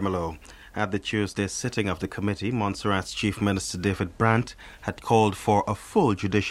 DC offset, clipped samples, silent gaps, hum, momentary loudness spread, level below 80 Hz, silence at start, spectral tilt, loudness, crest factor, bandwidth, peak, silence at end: under 0.1%; under 0.1%; none; none; 11 LU; -50 dBFS; 0 s; -5.5 dB/octave; -26 LUFS; 20 dB; 14 kHz; -4 dBFS; 0 s